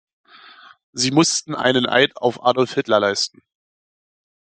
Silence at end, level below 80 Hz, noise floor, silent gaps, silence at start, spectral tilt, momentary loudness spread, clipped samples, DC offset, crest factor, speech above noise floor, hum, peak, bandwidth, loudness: 1.2 s; -64 dBFS; -46 dBFS; none; 0.95 s; -3.5 dB/octave; 6 LU; under 0.1%; under 0.1%; 20 dB; 27 dB; none; -2 dBFS; 9.4 kHz; -18 LUFS